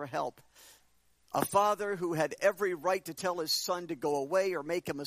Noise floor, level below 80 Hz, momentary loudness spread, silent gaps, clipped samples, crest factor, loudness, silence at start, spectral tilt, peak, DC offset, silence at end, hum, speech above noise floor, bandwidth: -68 dBFS; -74 dBFS; 7 LU; none; under 0.1%; 20 dB; -32 LUFS; 0 s; -3.5 dB/octave; -12 dBFS; under 0.1%; 0 s; none; 36 dB; 15.5 kHz